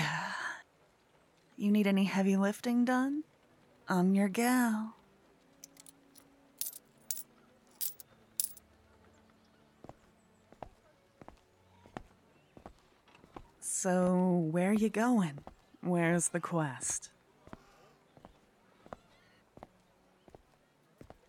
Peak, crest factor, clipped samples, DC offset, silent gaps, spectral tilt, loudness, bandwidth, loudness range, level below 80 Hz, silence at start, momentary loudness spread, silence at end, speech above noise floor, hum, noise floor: -12 dBFS; 24 dB; under 0.1%; under 0.1%; none; -5 dB/octave; -32 LUFS; 19 kHz; 12 LU; -70 dBFS; 0 s; 24 LU; 3 s; 38 dB; none; -68 dBFS